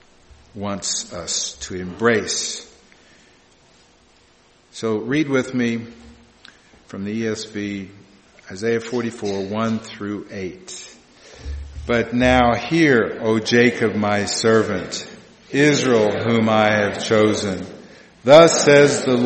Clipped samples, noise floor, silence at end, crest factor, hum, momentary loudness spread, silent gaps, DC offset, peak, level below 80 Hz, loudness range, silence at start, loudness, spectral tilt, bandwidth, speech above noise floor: under 0.1%; -54 dBFS; 0 s; 20 dB; none; 18 LU; none; under 0.1%; 0 dBFS; -44 dBFS; 10 LU; 0.55 s; -18 LUFS; -4.5 dB/octave; 8.8 kHz; 36 dB